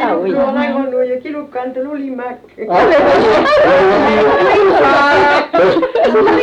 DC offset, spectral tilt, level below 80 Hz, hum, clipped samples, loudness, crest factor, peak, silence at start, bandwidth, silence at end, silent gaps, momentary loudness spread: under 0.1%; -5.5 dB/octave; -42 dBFS; none; under 0.1%; -11 LUFS; 10 dB; -2 dBFS; 0 s; 9.4 kHz; 0 s; none; 13 LU